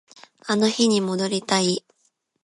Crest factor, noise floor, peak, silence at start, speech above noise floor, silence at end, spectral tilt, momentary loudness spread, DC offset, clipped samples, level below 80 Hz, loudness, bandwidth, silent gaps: 18 dB; -69 dBFS; -6 dBFS; 0.45 s; 48 dB; 0.65 s; -4 dB/octave; 8 LU; under 0.1%; under 0.1%; -70 dBFS; -22 LUFS; 11.5 kHz; none